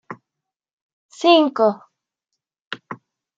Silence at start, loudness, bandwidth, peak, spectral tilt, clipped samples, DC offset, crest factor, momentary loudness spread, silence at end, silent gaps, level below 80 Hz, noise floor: 0.1 s; -17 LUFS; 7.8 kHz; -2 dBFS; -4.5 dB/octave; under 0.1%; under 0.1%; 20 dB; 24 LU; 0.4 s; 0.73-1.09 s, 2.60-2.71 s; -80 dBFS; -84 dBFS